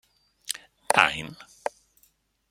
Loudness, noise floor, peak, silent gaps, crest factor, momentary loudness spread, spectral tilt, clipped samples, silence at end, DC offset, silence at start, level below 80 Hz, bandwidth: -26 LUFS; -66 dBFS; -2 dBFS; none; 28 dB; 18 LU; -1.5 dB/octave; under 0.1%; 1.05 s; under 0.1%; 0.5 s; -62 dBFS; 16.5 kHz